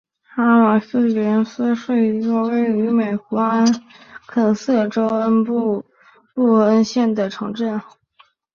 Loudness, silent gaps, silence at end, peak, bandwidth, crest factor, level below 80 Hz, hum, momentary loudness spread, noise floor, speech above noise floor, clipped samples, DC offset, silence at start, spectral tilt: -18 LUFS; none; 0.75 s; -2 dBFS; 7 kHz; 16 dB; -64 dBFS; none; 10 LU; -56 dBFS; 38 dB; under 0.1%; under 0.1%; 0.35 s; -6.5 dB/octave